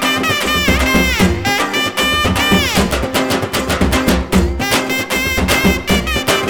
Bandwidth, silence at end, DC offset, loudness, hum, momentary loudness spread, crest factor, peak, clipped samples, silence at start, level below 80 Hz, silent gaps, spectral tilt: over 20 kHz; 0 s; under 0.1%; -14 LUFS; none; 4 LU; 14 dB; 0 dBFS; under 0.1%; 0 s; -24 dBFS; none; -4 dB/octave